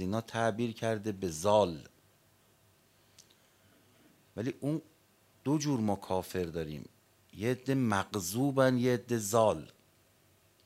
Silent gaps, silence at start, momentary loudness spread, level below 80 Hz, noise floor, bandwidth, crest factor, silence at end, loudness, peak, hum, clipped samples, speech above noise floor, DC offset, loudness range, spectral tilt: none; 0 s; 12 LU; -68 dBFS; -67 dBFS; 16 kHz; 22 dB; 1 s; -32 LUFS; -12 dBFS; none; under 0.1%; 35 dB; under 0.1%; 12 LU; -5.5 dB/octave